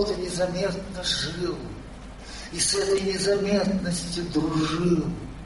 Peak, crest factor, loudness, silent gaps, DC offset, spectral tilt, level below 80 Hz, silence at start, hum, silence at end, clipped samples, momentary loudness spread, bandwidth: -10 dBFS; 16 dB; -25 LUFS; none; under 0.1%; -4 dB/octave; -42 dBFS; 0 s; none; 0 s; under 0.1%; 16 LU; 11.5 kHz